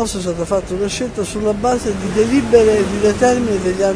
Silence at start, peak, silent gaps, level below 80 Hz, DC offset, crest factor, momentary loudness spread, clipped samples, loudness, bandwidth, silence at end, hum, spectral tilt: 0 s; 0 dBFS; none; -34 dBFS; under 0.1%; 16 dB; 9 LU; under 0.1%; -16 LUFS; 11 kHz; 0 s; none; -5 dB/octave